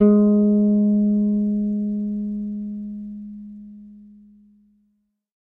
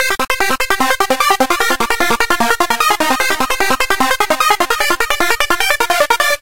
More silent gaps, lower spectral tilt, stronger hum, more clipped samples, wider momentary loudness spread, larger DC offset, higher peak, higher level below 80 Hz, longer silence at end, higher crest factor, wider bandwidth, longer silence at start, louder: neither; first, -13.5 dB/octave vs -1 dB/octave; neither; neither; first, 21 LU vs 2 LU; second, under 0.1% vs 6%; second, -4 dBFS vs 0 dBFS; second, -54 dBFS vs -36 dBFS; first, 1.45 s vs 0 s; about the same, 16 dB vs 14 dB; second, 1.6 kHz vs 17.5 kHz; about the same, 0 s vs 0 s; second, -20 LUFS vs -13 LUFS